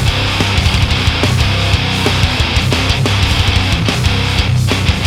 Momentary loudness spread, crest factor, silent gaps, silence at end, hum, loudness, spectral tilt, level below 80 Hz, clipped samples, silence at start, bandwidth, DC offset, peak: 1 LU; 12 dB; none; 0 s; none; -13 LUFS; -4.5 dB/octave; -20 dBFS; under 0.1%; 0 s; 15.5 kHz; under 0.1%; -2 dBFS